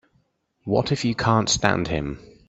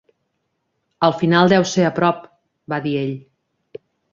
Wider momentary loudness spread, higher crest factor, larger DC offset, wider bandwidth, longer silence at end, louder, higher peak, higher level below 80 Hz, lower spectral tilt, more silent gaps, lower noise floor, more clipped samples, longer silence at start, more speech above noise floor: second, 10 LU vs 13 LU; first, 24 dB vs 18 dB; neither; first, 8.4 kHz vs 7.6 kHz; second, 0.2 s vs 0.95 s; second, -22 LUFS vs -18 LUFS; about the same, 0 dBFS vs -2 dBFS; first, -44 dBFS vs -60 dBFS; about the same, -4.5 dB/octave vs -5.5 dB/octave; neither; second, -67 dBFS vs -72 dBFS; neither; second, 0.65 s vs 1 s; second, 45 dB vs 55 dB